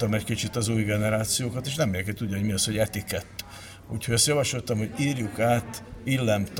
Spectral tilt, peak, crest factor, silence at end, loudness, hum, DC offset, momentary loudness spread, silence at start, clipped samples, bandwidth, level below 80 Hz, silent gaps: -4.5 dB/octave; -8 dBFS; 18 dB; 0 s; -26 LUFS; none; under 0.1%; 13 LU; 0 s; under 0.1%; 17 kHz; -50 dBFS; none